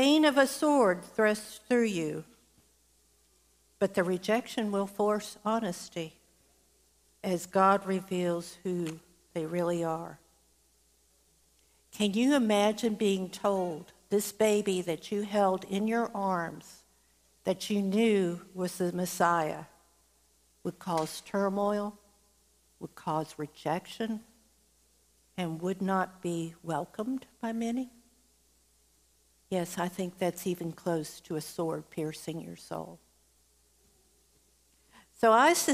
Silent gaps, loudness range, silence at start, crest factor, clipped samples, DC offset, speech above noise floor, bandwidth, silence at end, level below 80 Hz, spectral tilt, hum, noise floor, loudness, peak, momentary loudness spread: none; 8 LU; 0 s; 22 dB; under 0.1%; under 0.1%; 38 dB; 15.5 kHz; 0 s; -72 dBFS; -5 dB/octave; none; -68 dBFS; -31 LUFS; -10 dBFS; 15 LU